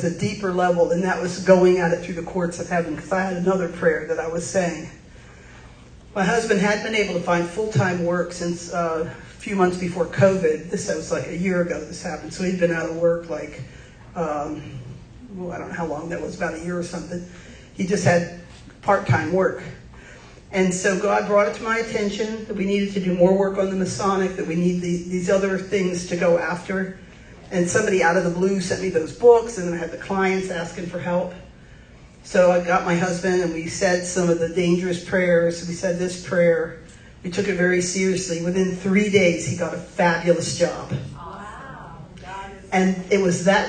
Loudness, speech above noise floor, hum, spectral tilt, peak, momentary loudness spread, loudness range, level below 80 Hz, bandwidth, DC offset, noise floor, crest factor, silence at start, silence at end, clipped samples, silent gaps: -22 LUFS; 24 dB; none; -5.5 dB/octave; -2 dBFS; 15 LU; 5 LU; -48 dBFS; 9.6 kHz; under 0.1%; -46 dBFS; 20 dB; 0 s; 0 s; under 0.1%; none